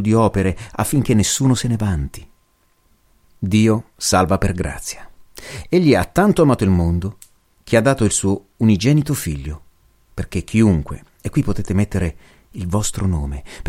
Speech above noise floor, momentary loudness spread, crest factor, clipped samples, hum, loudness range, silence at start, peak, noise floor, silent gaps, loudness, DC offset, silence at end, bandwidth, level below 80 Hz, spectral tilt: 42 dB; 15 LU; 16 dB; under 0.1%; none; 4 LU; 0 s; -2 dBFS; -59 dBFS; none; -18 LUFS; under 0.1%; 0 s; 16.5 kHz; -34 dBFS; -5.5 dB/octave